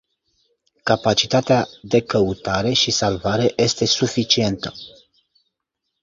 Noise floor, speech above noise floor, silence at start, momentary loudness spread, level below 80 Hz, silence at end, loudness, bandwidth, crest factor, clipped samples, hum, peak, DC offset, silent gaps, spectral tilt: -78 dBFS; 59 dB; 0.85 s; 6 LU; -48 dBFS; 1.15 s; -19 LUFS; 7.8 kHz; 20 dB; under 0.1%; none; -2 dBFS; under 0.1%; none; -4 dB/octave